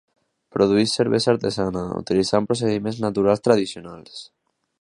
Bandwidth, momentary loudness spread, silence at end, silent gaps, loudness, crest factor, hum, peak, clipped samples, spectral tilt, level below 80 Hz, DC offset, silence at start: 11.5 kHz; 19 LU; 0.55 s; none; -21 LUFS; 20 dB; none; -2 dBFS; under 0.1%; -5.5 dB/octave; -52 dBFS; under 0.1%; 0.55 s